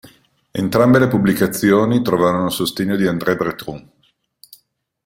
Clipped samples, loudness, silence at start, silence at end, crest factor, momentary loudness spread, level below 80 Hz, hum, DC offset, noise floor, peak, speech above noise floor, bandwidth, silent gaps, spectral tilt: under 0.1%; -16 LUFS; 0.05 s; 1.25 s; 16 dB; 13 LU; -50 dBFS; none; under 0.1%; -61 dBFS; 0 dBFS; 45 dB; 16.5 kHz; none; -6 dB/octave